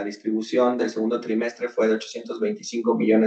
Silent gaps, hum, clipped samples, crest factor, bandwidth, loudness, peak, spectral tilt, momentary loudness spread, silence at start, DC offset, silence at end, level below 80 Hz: none; none; under 0.1%; 16 dB; 8.4 kHz; -24 LUFS; -6 dBFS; -5.5 dB/octave; 6 LU; 0 s; under 0.1%; 0 s; -80 dBFS